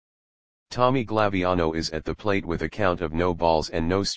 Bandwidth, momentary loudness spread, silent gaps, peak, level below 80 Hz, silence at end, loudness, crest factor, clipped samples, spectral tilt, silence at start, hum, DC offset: 9.8 kHz; 7 LU; none; -4 dBFS; -44 dBFS; 0 s; -24 LUFS; 20 dB; under 0.1%; -5.5 dB/octave; 0.65 s; none; 1%